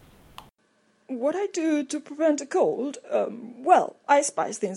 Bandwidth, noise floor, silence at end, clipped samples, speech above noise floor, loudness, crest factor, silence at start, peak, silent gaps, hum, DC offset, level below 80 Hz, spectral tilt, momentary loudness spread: 12 kHz; -66 dBFS; 0 s; under 0.1%; 42 dB; -25 LUFS; 22 dB; 0.4 s; -4 dBFS; none; none; under 0.1%; -70 dBFS; -3.5 dB/octave; 11 LU